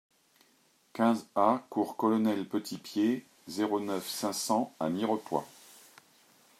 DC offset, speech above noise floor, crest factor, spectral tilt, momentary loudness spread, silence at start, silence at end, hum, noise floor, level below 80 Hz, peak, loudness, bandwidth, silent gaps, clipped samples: under 0.1%; 37 dB; 20 dB; -5 dB/octave; 8 LU; 0.95 s; 1.1 s; none; -68 dBFS; -82 dBFS; -12 dBFS; -31 LUFS; 15.5 kHz; none; under 0.1%